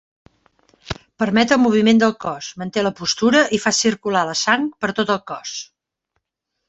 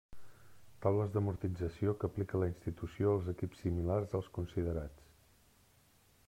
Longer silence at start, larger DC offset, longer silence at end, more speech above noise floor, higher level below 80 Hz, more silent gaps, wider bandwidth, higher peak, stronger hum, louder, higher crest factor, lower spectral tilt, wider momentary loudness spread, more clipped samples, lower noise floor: first, 0.85 s vs 0.1 s; neither; second, 1.05 s vs 1.35 s; first, 60 dB vs 32 dB; about the same, -54 dBFS vs -58 dBFS; neither; second, 8.2 kHz vs 14 kHz; first, -2 dBFS vs -18 dBFS; neither; first, -18 LUFS vs -37 LUFS; about the same, 18 dB vs 20 dB; second, -3.5 dB/octave vs -9 dB/octave; first, 14 LU vs 7 LU; neither; first, -78 dBFS vs -68 dBFS